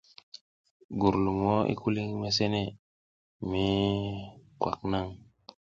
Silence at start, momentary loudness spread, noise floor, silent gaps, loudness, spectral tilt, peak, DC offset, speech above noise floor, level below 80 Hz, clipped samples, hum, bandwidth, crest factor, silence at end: 0.9 s; 22 LU; under -90 dBFS; 2.79-3.40 s; -30 LUFS; -6 dB/octave; -10 dBFS; under 0.1%; over 61 dB; -52 dBFS; under 0.1%; none; 7.4 kHz; 22 dB; 0.6 s